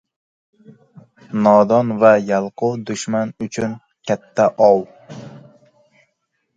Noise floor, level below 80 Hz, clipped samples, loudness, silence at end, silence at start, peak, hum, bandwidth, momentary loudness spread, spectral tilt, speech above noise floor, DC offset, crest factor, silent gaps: -71 dBFS; -62 dBFS; under 0.1%; -17 LUFS; 1.2 s; 1.3 s; 0 dBFS; none; 9.2 kHz; 18 LU; -6 dB/octave; 55 dB; under 0.1%; 18 dB; none